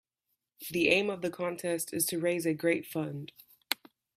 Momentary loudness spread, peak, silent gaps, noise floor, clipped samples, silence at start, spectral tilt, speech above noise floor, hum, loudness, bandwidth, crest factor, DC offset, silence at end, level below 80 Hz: 12 LU; -6 dBFS; none; -83 dBFS; under 0.1%; 0.6 s; -3.5 dB/octave; 52 dB; none; -31 LUFS; 16 kHz; 26 dB; under 0.1%; 0.45 s; -72 dBFS